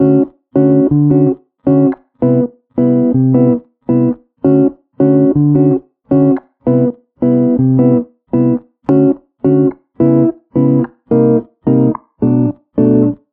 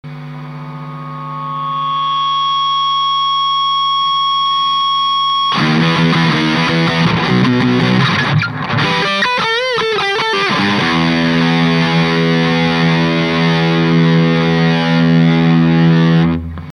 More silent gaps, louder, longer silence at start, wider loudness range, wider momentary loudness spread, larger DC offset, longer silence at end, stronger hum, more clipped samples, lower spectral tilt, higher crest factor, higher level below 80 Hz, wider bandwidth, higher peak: neither; about the same, -13 LUFS vs -13 LUFS; about the same, 0 s vs 0.05 s; about the same, 1 LU vs 2 LU; about the same, 6 LU vs 7 LU; neither; first, 0.15 s vs 0 s; neither; neither; first, -14 dB/octave vs -6 dB/octave; about the same, 12 dB vs 12 dB; about the same, -46 dBFS vs -42 dBFS; second, 3 kHz vs 10 kHz; about the same, 0 dBFS vs 0 dBFS